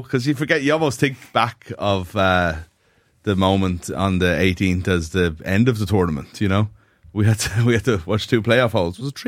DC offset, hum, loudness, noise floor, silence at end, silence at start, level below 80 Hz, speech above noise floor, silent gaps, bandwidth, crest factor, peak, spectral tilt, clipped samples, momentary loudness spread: under 0.1%; none; -20 LUFS; -60 dBFS; 0 s; 0 s; -42 dBFS; 41 dB; none; 16 kHz; 18 dB; -2 dBFS; -6 dB/octave; under 0.1%; 7 LU